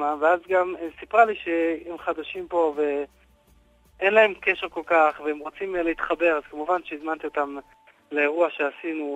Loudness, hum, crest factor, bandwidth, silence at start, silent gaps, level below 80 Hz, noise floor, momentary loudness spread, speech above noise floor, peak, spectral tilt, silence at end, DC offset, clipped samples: -24 LUFS; none; 20 dB; 8.2 kHz; 0 s; none; -60 dBFS; -58 dBFS; 11 LU; 35 dB; -4 dBFS; -5 dB/octave; 0 s; under 0.1%; under 0.1%